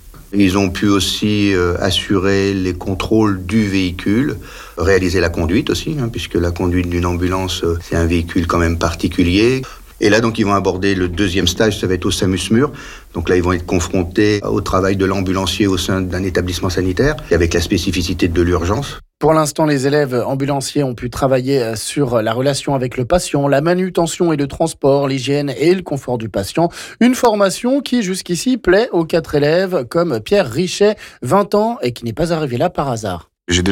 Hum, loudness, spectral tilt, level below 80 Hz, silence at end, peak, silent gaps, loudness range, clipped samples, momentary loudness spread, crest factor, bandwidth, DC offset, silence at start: none; -16 LUFS; -5.5 dB/octave; -36 dBFS; 0 s; -4 dBFS; none; 2 LU; under 0.1%; 6 LU; 12 dB; 17 kHz; under 0.1%; 0.05 s